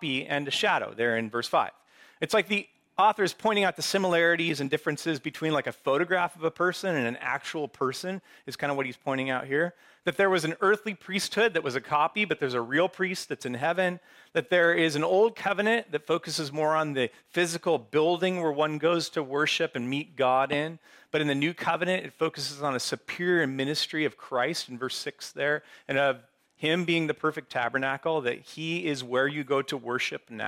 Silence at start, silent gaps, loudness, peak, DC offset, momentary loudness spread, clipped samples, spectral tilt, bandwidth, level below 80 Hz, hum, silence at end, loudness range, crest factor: 0 s; none; -28 LUFS; -12 dBFS; under 0.1%; 8 LU; under 0.1%; -4 dB/octave; 16.5 kHz; -76 dBFS; none; 0 s; 3 LU; 16 dB